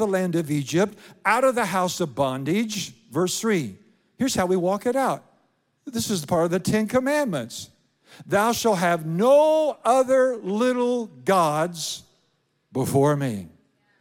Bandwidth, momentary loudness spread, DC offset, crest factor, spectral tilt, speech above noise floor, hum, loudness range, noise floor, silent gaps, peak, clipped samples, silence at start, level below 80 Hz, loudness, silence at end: 17 kHz; 10 LU; under 0.1%; 18 dB; -5 dB/octave; 47 dB; none; 5 LU; -69 dBFS; none; -6 dBFS; under 0.1%; 0 s; -60 dBFS; -23 LUFS; 0.5 s